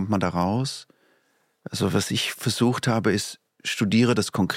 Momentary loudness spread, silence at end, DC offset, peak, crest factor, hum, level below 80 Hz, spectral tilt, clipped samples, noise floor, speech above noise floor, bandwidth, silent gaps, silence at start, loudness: 13 LU; 0 s; under 0.1%; -8 dBFS; 16 dB; none; -58 dBFS; -5 dB/octave; under 0.1%; -67 dBFS; 44 dB; 16.5 kHz; none; 0 s; -24 LUFS